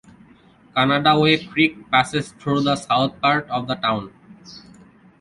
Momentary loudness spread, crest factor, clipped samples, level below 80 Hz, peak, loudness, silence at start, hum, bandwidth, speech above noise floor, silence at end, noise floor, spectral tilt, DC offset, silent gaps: 10 LU; 18 dB; under 0.1%; -56 dBFS; -2 dBFS; -19 LUFS; 0.75 s; none; 11.5 kHz; 32 dB; 0.6 s; -51 dBFS; -5.5 dB/octave; under 0.1%; none